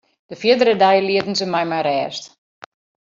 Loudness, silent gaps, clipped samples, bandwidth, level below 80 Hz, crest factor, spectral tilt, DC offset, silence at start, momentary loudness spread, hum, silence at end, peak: -17 LUFS; none; under 0.1%; 7.8 kHz; -66 dBFS; 16 dB; -4.5 dB/octave; under 0.1%; 0.3 s; 9 LU; none; 0.75 s; -2 dBFS